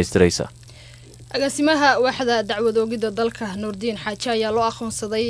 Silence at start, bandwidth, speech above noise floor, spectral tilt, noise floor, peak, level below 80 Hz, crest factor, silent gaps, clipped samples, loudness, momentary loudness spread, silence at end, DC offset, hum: 0 s; 11 kHz; 22 dB; -4 dB/octave; -43 dBFS; -2 dBFS; -48 dBFS; 20 dB; none; under 0.1%; -21 LUFS; 10 LU; 0 s; under 0.1%; none